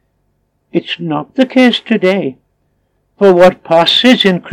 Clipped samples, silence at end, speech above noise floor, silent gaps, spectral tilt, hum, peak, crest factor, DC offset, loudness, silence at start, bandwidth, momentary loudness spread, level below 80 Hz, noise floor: 0.6%; 0 s; 52 dB; none; -5.5 dB/octave; none; 0 dBFS; 12 dB; under 0.1%; -10 LUFS; 0.75 s; 12.5 kHz; 11 LU; -52 dBFS; -62 dBFS